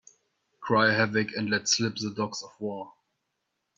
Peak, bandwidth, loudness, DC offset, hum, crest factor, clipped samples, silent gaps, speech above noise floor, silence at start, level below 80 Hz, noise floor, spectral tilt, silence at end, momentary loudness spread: -8 dBFS; 8.4 kHz; -27 LUFS; under 0.1%; none; 22 dB; under 0.1%; none; 53 dB; 0.6 s; -70 dBFS; -80 dBFS; -3.5 dB/octave; 0.85 s; 16 LU